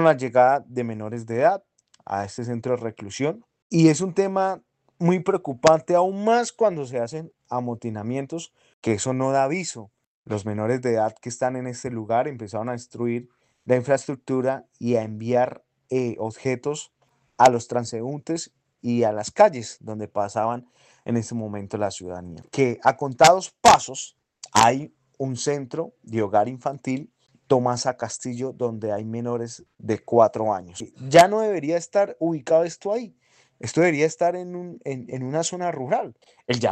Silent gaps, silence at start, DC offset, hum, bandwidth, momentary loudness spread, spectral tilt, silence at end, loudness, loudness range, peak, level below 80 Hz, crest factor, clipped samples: 3.62-3.70 s, 8.73-8.82 s, 10.07-10.25 s; 0 s; under 0.1%; none; 9.6 kHz; 15 LU; -5 dB/octave; 0 s; -23 LUFS; 6 LU; -2 dBFS; -62 dBFS; 20 dB; under 0.1%